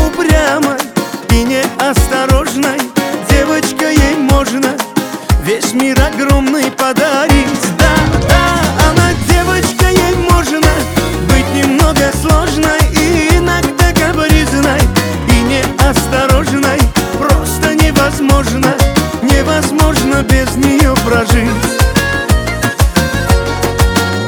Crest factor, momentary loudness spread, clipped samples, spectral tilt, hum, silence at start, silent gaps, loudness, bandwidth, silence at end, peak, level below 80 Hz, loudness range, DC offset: 10 dB; 4 LU; 0.3%; -5 dB/octave; none; 0 s; none; -11 LUFS; over 20 kHz; 0 s; 0 dBFS; -16 dBFS; 2 LU; under 0.1%